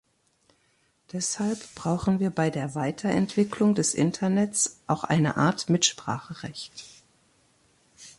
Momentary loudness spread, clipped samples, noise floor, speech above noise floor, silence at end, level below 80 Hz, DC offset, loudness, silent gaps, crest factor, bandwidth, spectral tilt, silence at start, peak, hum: 14 LU; under 0.1%; -68 dBFS; 42 dB; 0.1 s; -58 dBFS; under 0.1%; -26 LUFS; none; 20 dB; 11.5 kHz; -4.5 dB/octave; 1.15 s; -8 dBFS; none